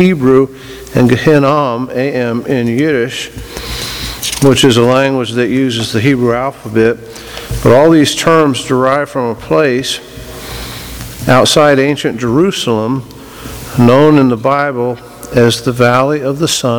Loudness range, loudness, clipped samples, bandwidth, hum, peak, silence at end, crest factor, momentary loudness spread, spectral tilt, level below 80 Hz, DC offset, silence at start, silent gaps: 2 LU; -11 LUFS; 0.5%; over 20 kHz; none; 0 dBFS; 0 s; 12 dB; 16 LU; -5 dB/octave; -36 dBFS; under 0.1%; 0 s; none